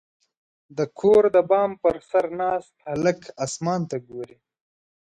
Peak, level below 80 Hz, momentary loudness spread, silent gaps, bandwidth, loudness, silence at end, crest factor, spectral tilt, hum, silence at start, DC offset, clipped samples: -6 dBFS; -60 dBFS; 16 LU; none; 9.8 kHz; -23 LUFS; 0.9 s; 18 dB; -6 dB/octave; none; 0.75 s; under 0.1%; under 0.1%